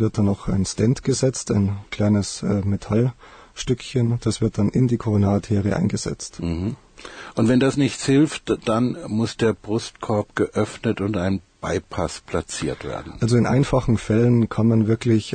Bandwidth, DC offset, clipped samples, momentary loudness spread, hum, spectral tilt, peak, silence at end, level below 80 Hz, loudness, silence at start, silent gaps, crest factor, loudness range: 9.4 kHz; under 0.1%; under 0.1%; 9 LU; none; -6.5 dB/octave; -6 dBFS; 0 s; -42 dBFS; -22 LUFS; 0 s; none; 14 dB; 3 LU